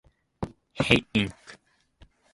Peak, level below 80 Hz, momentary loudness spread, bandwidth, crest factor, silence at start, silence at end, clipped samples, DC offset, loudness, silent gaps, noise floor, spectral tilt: -2 dBFS; -50 dBFS; 17 LU; 11.5 kHz; 28 dB; 0.4 s; 0.8 s; under 0.1%; under 0.1%; -25 LUFS; none; -58 dBFS; -5.5 dB/octave